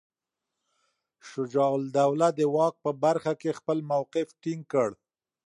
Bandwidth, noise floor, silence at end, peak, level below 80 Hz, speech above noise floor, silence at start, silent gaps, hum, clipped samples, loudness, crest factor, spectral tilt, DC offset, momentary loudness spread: 11.5 kHz; -87 dBFS; 0.5 s; -10 dBFS; -78 dBFS; 61 dB; 1.25 s; none; none; under 0.1%; -27 LUFS; 18 dB; -6.5 dB/octave; under 0.1%; 8 LU